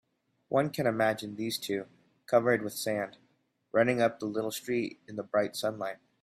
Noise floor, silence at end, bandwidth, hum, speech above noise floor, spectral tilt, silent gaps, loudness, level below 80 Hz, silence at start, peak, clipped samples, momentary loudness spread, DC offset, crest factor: -70 dBFS; 0.3 s; 16 kHz; none; 40 dB; -5 dB/octave; none; -31 LUFS; -74 dBFS; 0.5 s; -12 dBFS; under 0.1%; 11 LU; under 0.1%; 20 dB